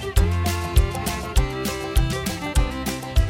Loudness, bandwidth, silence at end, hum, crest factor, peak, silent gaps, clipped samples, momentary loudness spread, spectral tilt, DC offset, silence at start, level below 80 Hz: -24 LUFS; 17 kHz; 0 s; none; 18 dB; -2 dBFS; none; under 0.1%; 5 LU; -5 dB/octave; under 0.1%; 0 s; -24 dBFS